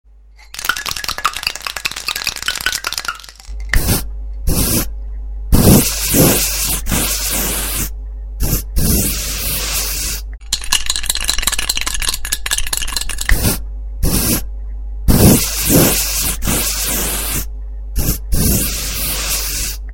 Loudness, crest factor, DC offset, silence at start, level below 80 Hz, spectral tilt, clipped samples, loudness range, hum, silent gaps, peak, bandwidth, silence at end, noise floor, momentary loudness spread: -16 LUFS; 16 dB; under 0.1%; 0.4 s; -22 dBFS; -3 dB/octave; under 0.1%; 5 LU; none; none; 0 dBFS; 17 kHz; 0 s; -42 dBFS; 14 LU